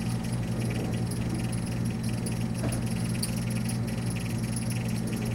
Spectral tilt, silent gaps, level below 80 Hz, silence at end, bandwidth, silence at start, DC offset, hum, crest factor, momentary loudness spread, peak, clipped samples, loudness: -6 dB/octave; none; -44 dBFS; 0 s; 16.5 kHz; 0 s; under 0.1%; none; 16 dB; 1 LU; -14 dBFS; under 0.1%; -30 LUFS